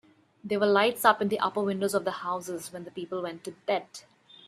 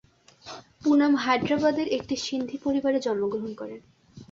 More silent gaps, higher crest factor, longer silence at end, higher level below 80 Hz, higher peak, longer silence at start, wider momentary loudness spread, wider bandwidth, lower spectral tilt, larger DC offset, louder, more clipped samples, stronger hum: neither; about the same, 22 dB vs 18 dB; first, 0.45 s vs 0.05 s; second, -76 dBFS vs -62 dBFS; first, -6 dBFS vs -10 dBFS; about the same, 0.45 s vs 0.45 s; second, 16 LU vs 20 LU; first, 15.5 kHz vs 7.6 kHz; about the same, -4 dB/octave vs -5 dB/octave; neither; second, -28 LUFS vs -25 LUFS; neither; neither